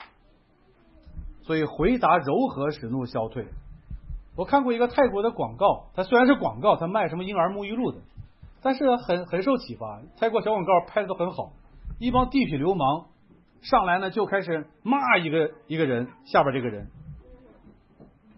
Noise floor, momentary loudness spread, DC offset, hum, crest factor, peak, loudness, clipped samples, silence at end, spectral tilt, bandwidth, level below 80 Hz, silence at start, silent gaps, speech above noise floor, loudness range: -60 dBFS; 18 LU; under 0.1%; none; 20 dB; -6 dBFS; -24 LUFS; under 0.1%; 1.05 s; -10.5 dB/octave; 5.8 kHz; -46 dBFS; 0 s; none; 36 dB; 3 LU